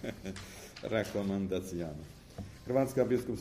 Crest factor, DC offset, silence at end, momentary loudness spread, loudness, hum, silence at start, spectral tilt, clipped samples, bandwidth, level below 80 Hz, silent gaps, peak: 20 dB; under 0.1%; 0 s; 17 LU; -35 LUFS; none; 0 s; -6.5 dB/octave; under 0.1%; 15.5 kHz; -56 dBFS; none; -14 dBFS